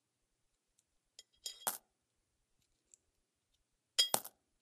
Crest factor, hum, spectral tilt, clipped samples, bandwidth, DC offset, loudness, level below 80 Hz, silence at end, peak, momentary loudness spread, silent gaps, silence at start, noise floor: 34 dB; none; 1 dB/octave; under 0.1%; 15.5 kHz; under 0.1%; -37 LUFS; -88 dBFS; 0.35 s; -12 dBFS; 17 LU; none; 1.2 s; -84 dBFS